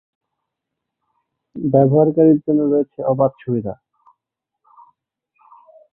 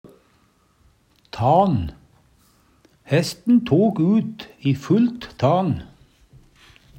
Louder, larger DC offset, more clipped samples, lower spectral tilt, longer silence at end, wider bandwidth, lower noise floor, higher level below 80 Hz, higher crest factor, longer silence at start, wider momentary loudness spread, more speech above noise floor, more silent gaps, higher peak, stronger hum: first, -16 LUFS vs -20 LUFS; neither; neither; first, -15 dB/octave vs -7.5 dB/octave; first, 2.2 s vs 1.1 s; second, 3.3 kHz vs 16 kHz; first, -81 dBFS vs -60 dBFS; second, -58 dBFS vs -50 dBFS; about the same, 18 dB vs 18 dB; first, 1.55 s vs 0.05 s; first, 16 LU vs 10 LU; first, 65 dB vs 41 dB; neither; about the same, -2 dBFS vs -4 dBFS; neither